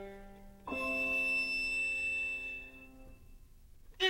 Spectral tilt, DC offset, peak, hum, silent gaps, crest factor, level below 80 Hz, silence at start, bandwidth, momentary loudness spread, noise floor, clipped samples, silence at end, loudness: -2 dB/octave; under 0.1%; -18 dBFS; none; none; 20 dB; -56 dBFS; 0 s; 16.5 kHz; 20 LU; -56 dBFS; under 0.1%; 0 s; -33 LUFS